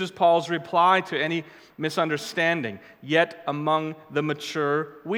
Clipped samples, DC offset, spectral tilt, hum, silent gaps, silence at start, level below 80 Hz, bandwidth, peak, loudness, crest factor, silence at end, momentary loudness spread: under 0.1%; under 0.1%; -5 dB/octave; none; none; 0 s; -76 dBFS; 17 kHz; -6 dBFS; -24 LUFS; 20 dB; 0 s; 9 LU